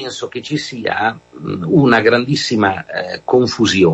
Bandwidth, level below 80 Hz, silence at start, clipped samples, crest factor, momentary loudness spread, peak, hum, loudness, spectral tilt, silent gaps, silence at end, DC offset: 8.2 kHz; -52 dBFS; 0 s; under 0.1%; 14 dB; 13 LU; 0 dBFS; none; -16 LUFS; -5 dB/octave; none; 0 s; under 0.1%